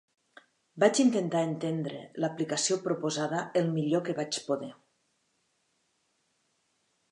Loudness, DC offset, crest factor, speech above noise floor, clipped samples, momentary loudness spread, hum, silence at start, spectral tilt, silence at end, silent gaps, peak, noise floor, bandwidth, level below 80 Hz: -29 LUFS; under 0.1%; 22 dB; 46 dB; under 0.1%; 9 LU; none; 0.75 s; -4.5 dB/octave; 2.4 s; none; -10 dBFS; -75 dBFS; 11 kHz; -82 dBFS